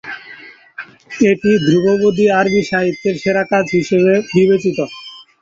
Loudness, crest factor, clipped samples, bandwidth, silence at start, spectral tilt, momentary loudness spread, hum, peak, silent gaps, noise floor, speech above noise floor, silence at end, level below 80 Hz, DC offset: -14 LUFS; 14 dB; under 0.1%; 7.8 kHz; 0.05 s; -6.5 dB/octave; 20 LU; none; -2 dBFS; none; -38 dBFS; 25 dB; 0.2 s; -52 dBFS; under 0.1%